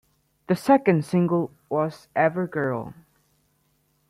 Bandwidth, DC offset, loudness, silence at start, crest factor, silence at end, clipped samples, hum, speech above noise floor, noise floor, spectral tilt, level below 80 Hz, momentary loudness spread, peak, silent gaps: 13.5 kHz; under 0.1%; -23 LUFS; 0.5 s; 20 dB; 1.15 s; under 0.1%; none; 45 dB; -68 dBFS; -8 dB/octave; -64 dBFS; 9 LU; -6 dBFS; none